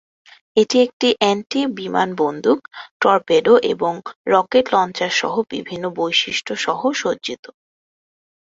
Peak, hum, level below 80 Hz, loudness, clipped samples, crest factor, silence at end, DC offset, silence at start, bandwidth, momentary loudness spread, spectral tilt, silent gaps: 0 dBFS; none; -62 dBFS; -18 LUFS; under 0.1%; 18 dB; 1.15 s; under 0.1%; 0.55 s; 7.8 kHz; 11 LU; -3.5 dB/octave; 0.93-1.00 s, 2.91-3.00 s, 4.16-4.25 s